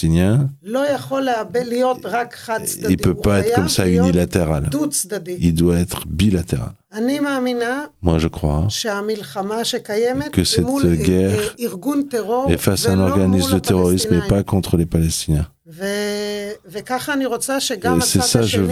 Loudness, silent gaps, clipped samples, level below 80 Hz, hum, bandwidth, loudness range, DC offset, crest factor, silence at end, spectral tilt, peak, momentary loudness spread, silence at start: -18 LUFS; none; under 0.1%; -36 dBFS; none; 16 kHz; 3 LU; under 0.1%; 18 dB; 0 s; -5 dB/octave; 0 dBFS; 8 LU; 0 s